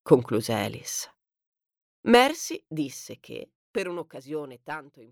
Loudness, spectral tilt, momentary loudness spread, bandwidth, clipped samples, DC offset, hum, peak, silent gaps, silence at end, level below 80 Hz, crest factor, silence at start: -26 LUFS; -4 dB/octave; 21 LU; 17.5 kHz; under 0.1%; under 0.1%; none; -4 dBFS; 1.47-1.52 s, 1.82-2.03 s, 3.55-3.74 s; 0.1 s; -64 dBFS; 24 dB; 0.05 s